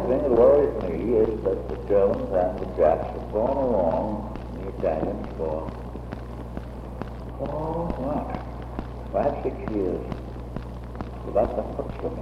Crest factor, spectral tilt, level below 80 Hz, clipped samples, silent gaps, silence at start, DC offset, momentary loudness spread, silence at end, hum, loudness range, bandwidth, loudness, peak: 18 dB; -9.5 dB/octave; -38 dBFS; under 0.1%; none; 0 s; under 0.1%; 14 LU; 0 s; none; 9 LU; 11.5 kHz; -26 LUFS; -6 dBFS